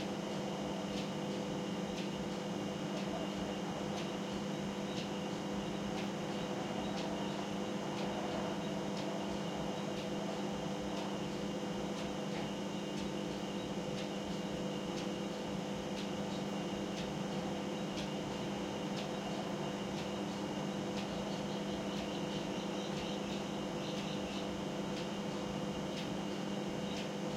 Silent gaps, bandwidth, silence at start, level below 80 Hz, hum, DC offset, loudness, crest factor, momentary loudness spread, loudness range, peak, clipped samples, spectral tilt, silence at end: none; 15.5 kHz; 0 s; -62 dBFS; none; under 0.1%; -40 LUFS; 14 dB; 1 LU; 1 LU; -26 dBFS; under 0.1%; -5 dB/octave; 0 s